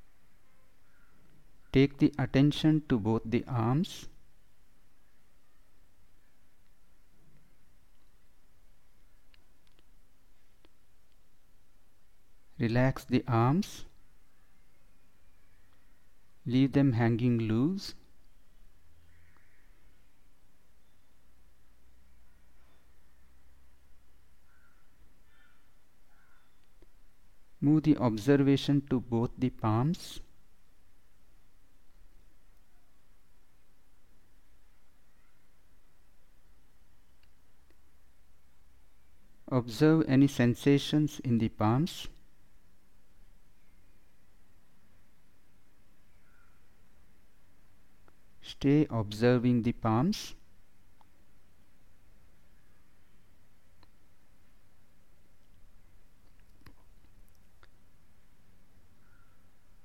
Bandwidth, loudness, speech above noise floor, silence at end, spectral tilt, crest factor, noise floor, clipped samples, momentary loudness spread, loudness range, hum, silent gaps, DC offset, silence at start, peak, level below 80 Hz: 16 kHz; -29 LUFS; 38 dB; 9.45 s; -7.5 dB/octave; 22 dB; -66 dBFS; under 0.1%; 13 LU; 10 LU; none; none; 0.3%; 1.75 s; -12 dBFS; -56 dBFS